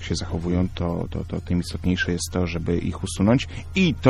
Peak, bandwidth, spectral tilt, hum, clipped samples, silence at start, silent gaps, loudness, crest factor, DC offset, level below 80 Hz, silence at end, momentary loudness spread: 0 dBFS; 13.5 kHz; -6 dB/octave; none; under 0.1%; 0 s; none; -24 LUFS; 22 dB; under 0.1%; -36 dBFS; 0 s; 7 LU